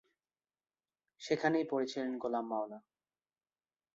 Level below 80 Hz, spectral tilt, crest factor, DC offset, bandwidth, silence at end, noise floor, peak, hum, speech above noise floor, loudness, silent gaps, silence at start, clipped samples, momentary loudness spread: -82 dBFS; -4 dB/octave; 24 dB; under 0.1%; 8 kHz; 1.15 s; under -90 dBFS; -16 dBFS; none; over 55 dB; -36 LUFS; none; 1.2 s; under 0.1%; 14 LU